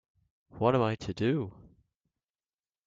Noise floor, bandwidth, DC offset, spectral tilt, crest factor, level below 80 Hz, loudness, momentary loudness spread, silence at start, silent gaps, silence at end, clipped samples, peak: under -90 dBFS; 7.8 kHz; under 0.1%; -7.5 dB/octave; 22 dB; -62 dBFS; -30 LUFS; 7 LU; 0.55 s; none; 1.35 s; under 0.1%; -12 dBFS